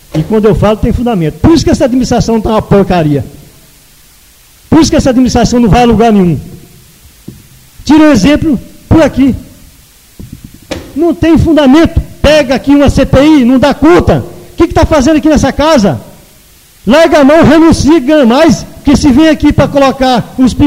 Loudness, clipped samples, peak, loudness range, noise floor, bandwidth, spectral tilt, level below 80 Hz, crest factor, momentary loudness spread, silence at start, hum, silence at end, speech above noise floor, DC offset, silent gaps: -7 LUFS; 2%; 0 dBFS; 4 LU; -40 dBFS; 16 kHz; -6 dB/octave; -22 dBFS; 8 dB; 8 LU; 0.15 s; none; 0 s; 34 dB; under 0.1%; none